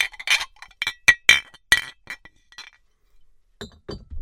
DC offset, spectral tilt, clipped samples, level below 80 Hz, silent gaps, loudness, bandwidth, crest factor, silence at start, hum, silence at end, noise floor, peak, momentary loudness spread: under 0.1%; 0.5 dB/octave; under 0.1%; -50 dBFS; none; -18 LUFS; 16.5 kHz; 24 dB; 0 s; none; 0 s; -56 dBFS; 0 dBFS; 24 LU